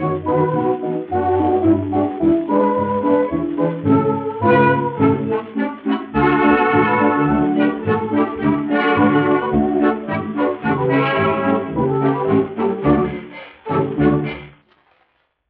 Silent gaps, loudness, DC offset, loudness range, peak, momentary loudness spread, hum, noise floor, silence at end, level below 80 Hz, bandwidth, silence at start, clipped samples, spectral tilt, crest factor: none; -17 LUFS; under 0.1%; 2 LU; -2 dBFS; 7 LU; none; -63 dBFS; 1 s; -44 dBFS; 4.6 kHz; 0 s; under 0.1%; -6 dB/octave; 16 dB